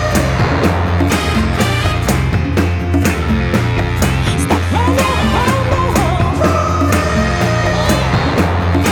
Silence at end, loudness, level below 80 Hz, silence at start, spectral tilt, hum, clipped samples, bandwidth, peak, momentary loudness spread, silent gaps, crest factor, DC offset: 0 s; -14 LUFS; -24 dBFS; 0 s; -5.5 dB/octave; none; under 0.1%; 19.5 kHz; -2 dBFS; 2 LU; none; 12 dB; under 0.1%